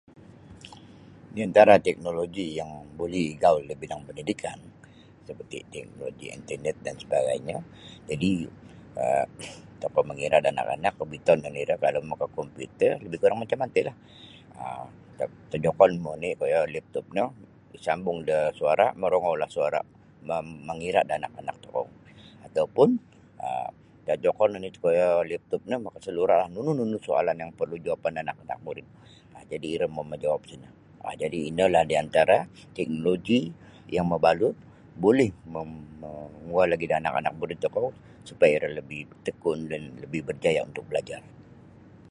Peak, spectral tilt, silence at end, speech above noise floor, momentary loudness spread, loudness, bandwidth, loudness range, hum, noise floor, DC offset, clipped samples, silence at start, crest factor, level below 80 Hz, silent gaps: -2 dBFS; -6 dB/octave; 0.7 s; 26 dB; 17 LU; -26 LUFS; 11.5 kHz; 6 LU; none; -52 dBFS; under 0.1%; under 0.1%; 0.5 s; 24 dB; -58 dBFS; none